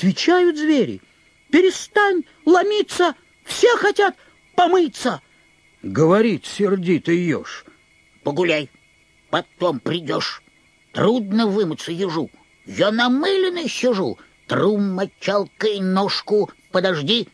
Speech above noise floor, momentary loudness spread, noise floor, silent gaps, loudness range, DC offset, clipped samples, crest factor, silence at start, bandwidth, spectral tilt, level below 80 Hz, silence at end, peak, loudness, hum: 38 dB; 11 LU; -56 dBFS; none; 5 LU; under 0.1%; under 0.1%; 16 dB; 0 s; 11 kHz; -5 dB/octave; -64 dBFS; 0.1 s; -4 dBFS; -19 LUFS; none